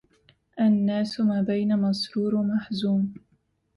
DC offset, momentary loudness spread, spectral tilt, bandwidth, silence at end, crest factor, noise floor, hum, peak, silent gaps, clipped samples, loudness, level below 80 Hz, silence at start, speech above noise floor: under 0.1%; 4 LU; -7.5 dB/octave; 11.5 kHz; 0.6 s; 12 dB; -63 dBFS; none; -14 dBFS; none; under 0.1%; -25 LUFS; -64 dBFS; 0.55 s; 39 dB